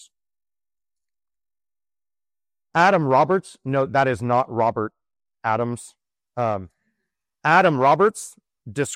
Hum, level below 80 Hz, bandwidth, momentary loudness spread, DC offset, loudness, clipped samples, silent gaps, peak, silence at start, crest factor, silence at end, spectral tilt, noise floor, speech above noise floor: none; -62 dBFS; 15 kHz; 15 LU; under 0.1%; -20 LUFS; under 0.1%; none; -4 dBFS; 2.75 s; 20 dB; 0 s; -5.5 dB/octave; under -90 dBFS; over 70 dB